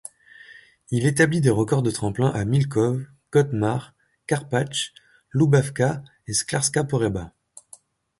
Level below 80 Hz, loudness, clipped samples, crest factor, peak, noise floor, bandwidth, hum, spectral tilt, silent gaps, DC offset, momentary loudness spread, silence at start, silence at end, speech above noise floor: -52 dBFS; -23 LUFS; under 0.1%; 18 dB; -4 dBFS; -52 dBFS; 11.5 kHz; none; -5.5 dB/octave; none; under 0.1%; 12 LU; 0.5 s; 0.9 s; 30 dB